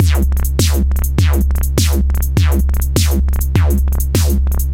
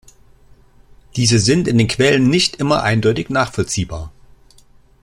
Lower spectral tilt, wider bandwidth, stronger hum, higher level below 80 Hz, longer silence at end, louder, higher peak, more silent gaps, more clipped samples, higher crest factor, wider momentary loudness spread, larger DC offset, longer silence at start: about the same, -5.5 dB/octave vs -4.5 dB/octave; first, 17 kHz vs 13 kHz; neither; first, -14 dBFS vs -42 dBFS; second, 0 s vs 0.9 s; about the same, -15 LUFS vs -16 LUFS; about the same, 0 dBFS vs 0 dBFS; neither; neither; about the same, 12 dB vs 16 dB; second, 2 LU vs 13 LU; neither; second, 0 s vs 1.15 s